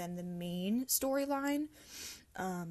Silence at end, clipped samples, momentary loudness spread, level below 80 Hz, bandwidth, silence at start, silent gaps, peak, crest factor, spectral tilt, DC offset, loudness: 0 s; under 0.1%; 14 LU; -68 dBFS; 12.5 kHz; 0 s; none; -18 dBFS; 18 dB; -4 dB/octave; under 0.1%; -37 LUFS